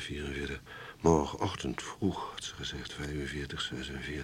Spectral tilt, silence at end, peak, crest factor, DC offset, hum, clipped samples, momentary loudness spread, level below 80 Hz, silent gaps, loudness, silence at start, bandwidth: -5 dB/octave; 0 s; -12 dBFS; 24 dB; under 0.1%; none; under 0.1%; 12 LU; -48 dBFS; none; -35 LUFS; 0 s; 16 kHz